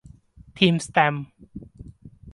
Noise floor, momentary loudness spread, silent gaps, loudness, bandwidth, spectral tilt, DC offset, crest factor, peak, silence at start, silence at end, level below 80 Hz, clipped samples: -49 dBFS; 23 LU; none; -21 LUFS; 11.5 kHz; -5 dB/octave; under 0.1%; 22 dB; -4 dBFS; 0.55 s; 0.05 s; -52 dBFS; under 0.1%